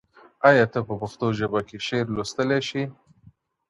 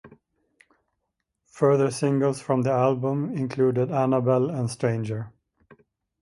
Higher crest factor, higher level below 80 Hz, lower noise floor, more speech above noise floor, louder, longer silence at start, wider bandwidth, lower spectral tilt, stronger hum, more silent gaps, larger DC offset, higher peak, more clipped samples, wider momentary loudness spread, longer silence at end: about the same, 20 dB vs 18 dB; first, -56 dBFS vs -64 dBFS; second, -56 dBFS vs -80 dBFS; second, 33 dB vs 57 dB; about the same, -24 LUFS vs -24 LUFS; first, 0.4 s vs 0.05 s; about the same, 11.5 kHz vs 11.5 kHz; second, -5.5 dB/octave vs -7.5 dB/octave; neither; neither; neither; first, -4 dBFS vs -8 dBFS; neither; first, 12 LU vs 7 LU; about the same, 0.8 s vs 0.9 s